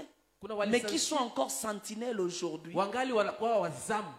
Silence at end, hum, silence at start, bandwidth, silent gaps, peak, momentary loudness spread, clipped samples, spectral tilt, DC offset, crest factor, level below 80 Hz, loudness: 0 s; none; 0 s; 16 kHz; none; -14 dBFS; 7 LU; under 0.1%; -3 dB/octave; under 0.1%; 18 dB; -74 dBFS; -33 LUFS